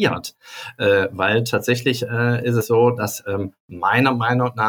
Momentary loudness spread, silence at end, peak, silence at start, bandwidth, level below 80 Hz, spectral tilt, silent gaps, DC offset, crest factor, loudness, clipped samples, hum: 12 LU; 0 s; -4 dBFS; 0 s; 19.5 kHz; -60 dBFS; -5.5 dB/octave; 3.60-3.68 s; under 0.1%; 16 dB; -19 LUFS; under 0.1%; none